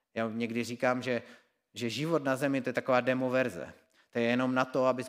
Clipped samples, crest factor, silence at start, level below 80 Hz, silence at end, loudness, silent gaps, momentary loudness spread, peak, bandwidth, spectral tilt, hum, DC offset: under 0.1%; 20 dB; 0.15 s; -76 dBFS; 0 s; -31 LUFS; none; 10 LU; -10 dBFS; 16 kHz; -5.5 dB/octave; none; under 0.1%